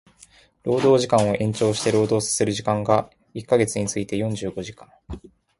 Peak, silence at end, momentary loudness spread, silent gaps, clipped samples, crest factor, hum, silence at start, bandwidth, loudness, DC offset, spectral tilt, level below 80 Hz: -4 dBFS; 0.3 s; 19 LU; none; under 0.1%; 20 dB; none; 0.65 s; 11.5 kHz; -22 LUFS; under 0.1%; -5 dB/octave; -50 dBFS